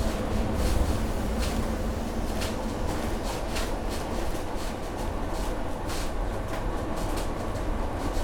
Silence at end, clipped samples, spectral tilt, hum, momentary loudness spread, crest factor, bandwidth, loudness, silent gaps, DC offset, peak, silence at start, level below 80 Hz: 0 s; under 0.1%; -5.5 dB/octave; none; 5 LU; 16 dB; 18.5 kHz; -31 LUFS; none; under 0.1%; -12 dBFS; 0 s; -32 dBFS